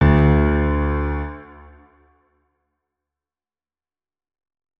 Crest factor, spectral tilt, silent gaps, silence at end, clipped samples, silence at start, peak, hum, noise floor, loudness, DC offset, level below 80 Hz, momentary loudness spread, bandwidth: 18 dB; -10.5 dB/octave; none; 3.35 s; under 0.1%; 0 s; -4 dBFS; none; under -90 dBFS; -19 LUFS; under 0.1%; -26 dBFS; 17 LU; 3.8 kHz